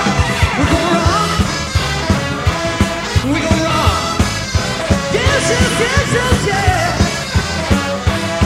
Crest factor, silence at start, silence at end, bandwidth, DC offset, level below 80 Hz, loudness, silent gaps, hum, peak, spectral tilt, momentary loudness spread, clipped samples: 14 dB; 0 s; 0 s; 16 kHz; under 0.1%; -24 dBFS; -15 LUFS; none; none; 0 dBFS; -4.5 dB/octave; 4 LU; under 0.1%